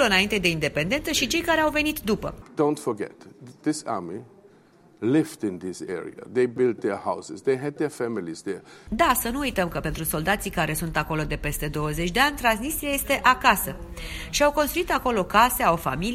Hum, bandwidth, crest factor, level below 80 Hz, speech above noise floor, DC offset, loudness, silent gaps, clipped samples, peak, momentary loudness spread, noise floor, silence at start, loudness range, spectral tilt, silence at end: none; 16 kHz; 22 dB; -42 dBFS; 30 dB; under 0.1%; -24 LUFS; none; under 0.1%; -4 dBFS; 13 LU; -55 dBFS; 0 s; 6 LU; -4 dB/octave; 0 s